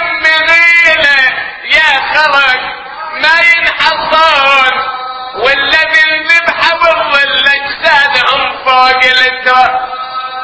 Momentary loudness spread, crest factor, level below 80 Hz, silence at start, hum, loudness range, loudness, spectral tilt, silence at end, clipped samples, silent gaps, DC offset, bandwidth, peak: 11 LU; 10 dB; -44 dBFS; 0 s; none; 1 LU; -7 LUFS; -1.5 dB/octave; 0 s; 2%; none; under 0.1%; 8 kHz; 0 dBFS